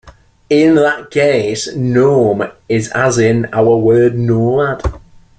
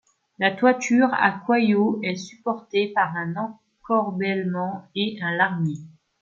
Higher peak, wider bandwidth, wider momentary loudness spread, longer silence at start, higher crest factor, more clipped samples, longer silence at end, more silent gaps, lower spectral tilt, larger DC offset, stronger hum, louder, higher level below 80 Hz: first, 0 dBFS vs -4 dBFS; first, 9.2 kHz vs 7.4 kHz; about the same, 8 LU vs 10 LU; second, 0.05 s vs 0.4 s; second, 12 dB vs 20 dB; neither; about the same, 0.4 s vs 0.35 s; neither; about the same, -6 dB/octave vs -5.5 dB/octave; neither; neither; first, -13 LUFS vs -23 LUFS; first, -34 dBFS vs -70 dBFS